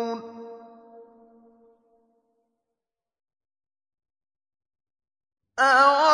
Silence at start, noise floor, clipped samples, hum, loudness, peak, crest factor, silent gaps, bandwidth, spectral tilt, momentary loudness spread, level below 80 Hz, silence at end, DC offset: 0 s; -88 dBFS; under 0.1%; none; -19 LUFS; -6 dBFS; 22 dB; none; 10 kHz; -1.5 dB/octave; 26 LU; -84 dBFS; 0 s; under 0.1%